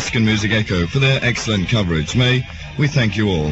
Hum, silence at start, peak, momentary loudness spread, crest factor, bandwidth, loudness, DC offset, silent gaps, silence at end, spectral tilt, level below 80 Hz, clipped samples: none; 0 s; -2 dBFS; 3 LU; 14 dB; 8.2 kHz; -17 LUFS; under 0.1%; none; 0 s; -5.5 dB/octave; -36 dBFS; under 0.1%